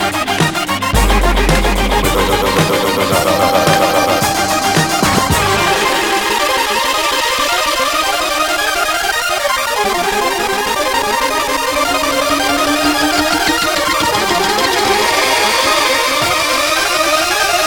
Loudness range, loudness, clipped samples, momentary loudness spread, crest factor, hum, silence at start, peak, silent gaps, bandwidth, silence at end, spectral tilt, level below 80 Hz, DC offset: 2 LU; -13 LUFS; under 0.1%; 3 LU; 14 dB; none; 0 s; 0 dBFS; none; 19 kHz; 0 s; -2.5 dB/octave; -26 dBFS; under 0.1%